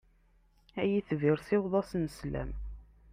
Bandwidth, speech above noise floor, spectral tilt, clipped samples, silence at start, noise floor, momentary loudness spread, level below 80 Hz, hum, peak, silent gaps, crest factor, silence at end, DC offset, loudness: 15.5 kHz; 35 dB; -8 dB/octave; under 0.1%; 0.75 s; -66 dBFS; 14 LU; -48 dBFS; none; -16 dBFS; none; 18 dB; 0.3 s; under 0.1%; -32 LUFS